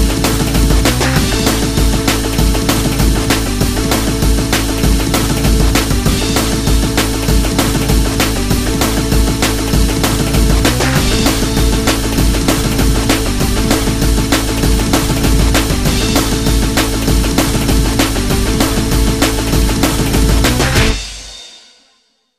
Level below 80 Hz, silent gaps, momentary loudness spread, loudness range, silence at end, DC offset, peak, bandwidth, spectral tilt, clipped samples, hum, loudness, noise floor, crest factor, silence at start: -16 dBFS; none; 2 LU; 1 LU; 0.8 s; under 0.1%; 0 dBFS; 16 kHz; -4.5 dB/octave; under 0.1%; none; -13 LUFS; -57 dBFS; 12 dB; 0 s